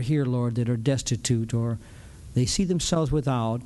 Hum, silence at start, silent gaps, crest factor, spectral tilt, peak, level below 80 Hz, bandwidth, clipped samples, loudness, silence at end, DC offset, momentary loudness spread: none; 0 s; none; 14 dB; -5.5 dB/octave; -12 dBFS; -42 dBFS; 12 kHz; under 0.1%; -25 LUFS; 0 s; under 0.1%; 6 LU